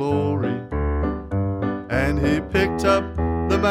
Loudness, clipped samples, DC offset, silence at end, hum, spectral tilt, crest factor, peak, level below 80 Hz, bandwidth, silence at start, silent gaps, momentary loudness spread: -22 LUFS; under 0.1%; under 0.1%; 0 s; none; -7 dB/octave; 16 dB; -6 dBFS; -32 dBFS; 14.5 kHz; 0 s; none; 5 LU